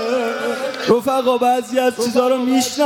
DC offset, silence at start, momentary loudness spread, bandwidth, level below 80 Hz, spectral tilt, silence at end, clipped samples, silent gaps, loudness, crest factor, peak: under 0.1%; 0 s; 6 LU; 17 kHz; -62 dBFS; -3.5 dB/octave; 0 s; under 0.1%; none; -17 LUFS; 16 dB; -2 dBFS